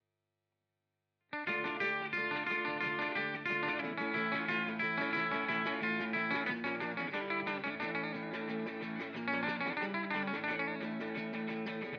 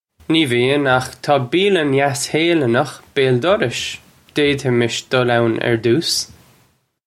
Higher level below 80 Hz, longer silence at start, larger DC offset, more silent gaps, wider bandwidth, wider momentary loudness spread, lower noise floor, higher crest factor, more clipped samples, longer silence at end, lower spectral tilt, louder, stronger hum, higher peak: second, -82 dBFS vs -54 dBFS; first, 1.3 s vs 0.3 s; neither; neither; second, 6.8 kHz vs 15.5 kHz; about the same, 6 LU vs 6 LU; first, -87 dBFS vs -58 dBFS; about the same, 16 dB vs 16 dB; neither; second, 0 s vs 0.8 s; first, -6.5 dB/octave vs -4.5 dB/octave; second, -36 LUFS vs -17 LUFS; first, 50 Hz at -70 dBFS vs none; second, -22 dBFS vs -2 dBFS